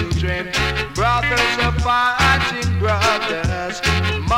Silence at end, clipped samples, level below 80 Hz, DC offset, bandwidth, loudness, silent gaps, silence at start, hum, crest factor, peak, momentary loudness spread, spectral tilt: 0 s; under 0.1%; -28 dBFS; under 0.1%; 16 kHz; -18 LUFS; none; 0 s; none; 14 dB; -4 dBFS; 6 LU; -4 dB/octave